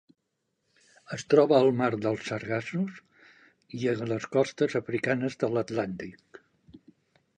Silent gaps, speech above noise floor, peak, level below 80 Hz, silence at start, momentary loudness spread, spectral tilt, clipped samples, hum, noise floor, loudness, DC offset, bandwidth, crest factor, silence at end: none; 52 dB; -6 dBFS; -68 dBFS; 1.1 s; 15 LU; -6.5 dB/octave; under 0.1%; none; -79 dBFS; -27 LUFS; under 0.1%; 9.6 kHz; 22 dB; 0.6 s